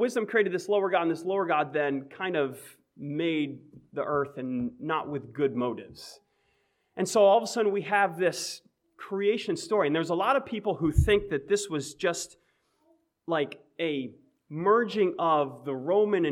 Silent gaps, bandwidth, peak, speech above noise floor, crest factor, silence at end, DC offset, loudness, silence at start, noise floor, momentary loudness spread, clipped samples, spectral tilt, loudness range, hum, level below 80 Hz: none; 15.5 kHz; -8 dBFS; 45 dB; 20 dB; 0 s; under 0.1%; -28 LUFS; 0 s; -72 dBFS; 14 LU; under 0.1%; -5 dB/octave; 5 LU; none; -46 dBFS